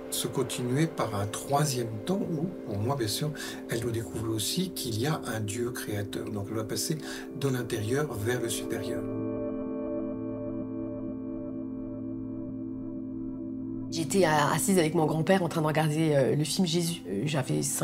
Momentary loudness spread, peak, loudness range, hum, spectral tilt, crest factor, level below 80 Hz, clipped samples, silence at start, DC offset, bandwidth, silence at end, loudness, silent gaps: 12 LU; -10 dBFS; 9 LU; none; -5 dB/octave; 20 dB; -56 dBFS; under 0.1%; 0 s; under 0.1%; 16 kHz; 0 s; -30 LUFS; none